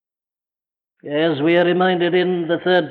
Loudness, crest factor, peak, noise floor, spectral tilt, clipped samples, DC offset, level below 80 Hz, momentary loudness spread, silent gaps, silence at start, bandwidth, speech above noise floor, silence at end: -18 LUFS; 14 dB; -6 dBFS; under -90 dBFS; -9 dB/octave; under 0.1%; under 0.1%; -70 dBFS; 5 LU; none; 1.05 s; 4.6 kHz; over 73 dB; 0 s